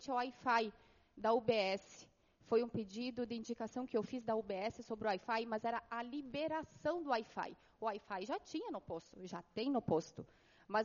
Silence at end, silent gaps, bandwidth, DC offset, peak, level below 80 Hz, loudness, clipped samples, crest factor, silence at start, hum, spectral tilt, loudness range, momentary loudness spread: 0 s; none; 7.2 kHz; under 0.1%; -22 dBFS; -74 dBFS; -41 LUFS; under 0.1%; 20 dB; 0 s; none; -3.5 dB/octave; 4 LU; 11 LU